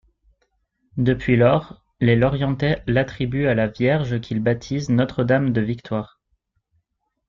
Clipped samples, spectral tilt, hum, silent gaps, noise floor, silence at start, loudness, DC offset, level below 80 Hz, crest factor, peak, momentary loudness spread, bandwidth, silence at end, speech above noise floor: under 0.1%; -8 dB/octave; none; none; -73 dBFS; 0.95 s; -21 LUFS; under 0.1%; -44 dBFS; 18 dB; -4 dBFS; 8 LU; 7.2 kHz; 1.2 s; 54 dB